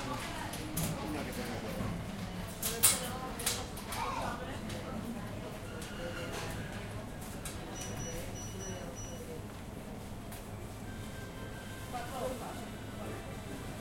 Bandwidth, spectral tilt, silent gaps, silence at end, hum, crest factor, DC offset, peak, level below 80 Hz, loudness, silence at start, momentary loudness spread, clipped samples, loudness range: 16.5 kHz; -3.5 dB/octave; none; 0 s; none; 28 dB; under 0.1%; -10 dBFS; -50 dBFS; -38 LUFS; 0 s; 10 LU; under 0.1%; 10 LU